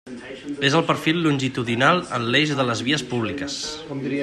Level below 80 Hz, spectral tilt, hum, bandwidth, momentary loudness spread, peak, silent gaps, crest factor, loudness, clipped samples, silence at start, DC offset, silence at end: -58 dBFS; -4.5 dB/octave; none; 13.5 kHz; 11 LU; -4 dBFS; none; 18 dB; -21 LUFS; under 0.1%; 0.05 s; under 0.1%; 0 s